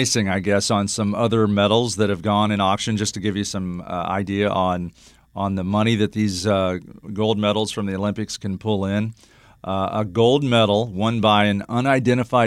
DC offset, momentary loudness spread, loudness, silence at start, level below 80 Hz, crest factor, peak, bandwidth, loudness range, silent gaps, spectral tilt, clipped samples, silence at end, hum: under 0.1%; 10 LU; -21 LUFS; 0 s; -52 dBFS; 18 dB; -4 dBFS; 14 kHz; 4 LU; none; -5 dB/octave; under 0.1%; 0 s; none